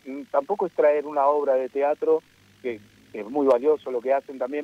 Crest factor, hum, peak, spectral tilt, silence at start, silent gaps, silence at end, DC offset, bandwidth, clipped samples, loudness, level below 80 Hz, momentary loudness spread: 16 dB; 50 Hz at -70 dBFS; -8 dBFS; -6.5 dB/octave; 0.05 s; none; 0 s; under 0.1%; 8.4 kHz; under 0.1%; -24 LUFS; -74 dBFS; 13 LU